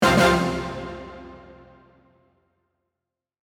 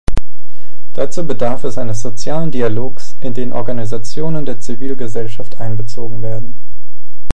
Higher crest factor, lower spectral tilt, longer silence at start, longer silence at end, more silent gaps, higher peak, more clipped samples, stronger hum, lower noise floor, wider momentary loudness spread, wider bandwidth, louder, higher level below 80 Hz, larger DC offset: about the same, 22 dB vs 18 dB; second, -5 dB/octave vs -6.5 dB/octave; about the same, 0 s vs 0.05 s; first, 2.15 s vs 0 s; neither; second, -4 dBFS vs 0 dBFS; second, under 0.1% vs 0.6%; neither; first, -85 dBFS vs -47 dBFS; first, 26 LU vs 8 LU; first, 19.5 kHz vs 11.5 kHz; about the same, -21 LUFS vs -23 LUFS; second, -44 dBFS vs -32 dBFS; second, under 0.1% vs 70%